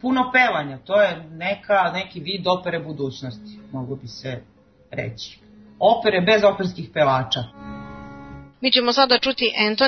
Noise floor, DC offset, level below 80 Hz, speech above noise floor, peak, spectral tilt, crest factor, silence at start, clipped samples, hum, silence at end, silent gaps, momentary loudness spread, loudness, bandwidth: -40 dBFS; under 0.1%; -54 dBFS; 19 dB; -2 dBFS; -5 dB/octave; 20 dB; 0 s; under 0.1%; none; 0 s; none; 20 LU; -20 LUFS; 6.4 kHz